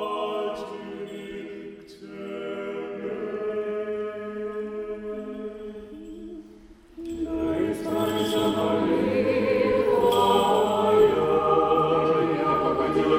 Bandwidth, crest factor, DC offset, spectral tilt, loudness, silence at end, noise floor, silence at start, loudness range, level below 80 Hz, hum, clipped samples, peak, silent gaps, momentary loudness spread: 16 kHz; 18 dB; under 0.1%; -6 dB/octave; -24 LUFS; 0 s; -49 dBFS; 0 s; 13 LU; -52 dBFS; none; under 0.1%; -8 dBFS; none; 19 LU